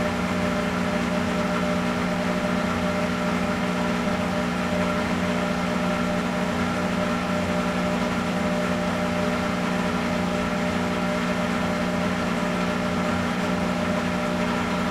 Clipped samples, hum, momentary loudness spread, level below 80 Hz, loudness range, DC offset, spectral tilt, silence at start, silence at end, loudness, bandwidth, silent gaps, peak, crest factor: under 0.1%; 60 Hz at -30 dBFS; 1 LU; -44 dBFS; 0 LU; under 0.1%; -5.5 dB/octave; 0 s; 0 s; -24 LUFS; 15 kHz; none; -10 dBFS; 14 dB